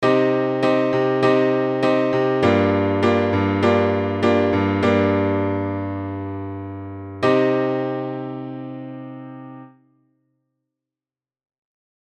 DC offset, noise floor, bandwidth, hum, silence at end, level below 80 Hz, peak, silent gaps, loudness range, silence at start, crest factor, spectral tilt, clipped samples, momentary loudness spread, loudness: under 0.1%; under -90 dBFS; 8.8 kHz; none; 2.4 s; -64 dBFS; -2 dBFS; none; 15 LU; 0 s; 18 dB; -7.5 dB/octave; under 0.1%; 16 LU; -19 LUFS